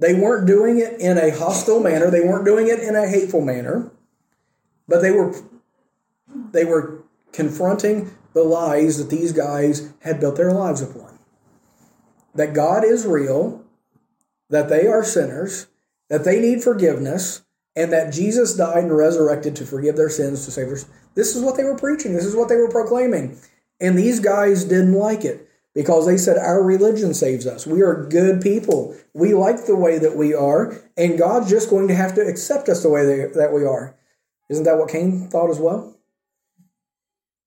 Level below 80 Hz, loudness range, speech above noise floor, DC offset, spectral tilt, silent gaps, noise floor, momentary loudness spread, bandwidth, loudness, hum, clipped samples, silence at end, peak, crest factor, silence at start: -64 dBFS; 5 LU; over 73 dB; under 0.1%; -6 dB/octave; none; under -90 dBFS; 11 LU; 17 kHz; -18 LUFS; none; under 0.1%; 1.55 s; -4 dBFS; 14 dB; 0 s